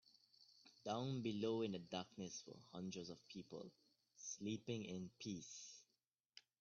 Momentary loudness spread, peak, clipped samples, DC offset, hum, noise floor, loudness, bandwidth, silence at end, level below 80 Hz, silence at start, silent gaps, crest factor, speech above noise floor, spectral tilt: 22 LU; -30 dBFS; under 0.1%; under 0.1%; none; -90 dBFS; -49 LUFS; 7.2 kHz; 0.2 s; -86 dBFS; 0.4 s; none; 20 dB; 41 dB; -5.5 dB/octave